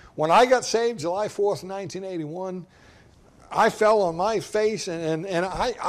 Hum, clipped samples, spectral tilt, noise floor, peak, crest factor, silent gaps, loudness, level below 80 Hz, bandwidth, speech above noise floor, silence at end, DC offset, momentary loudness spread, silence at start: none; under 0.1%; -4 dB/octave; -53 dBFS; -8 dBFS; 16 dB; none; -24 LUFS; -52 dBFS; 14.5 kHz; 30 dB; 0 s; under 0.1%; 14 LU; 0.15 s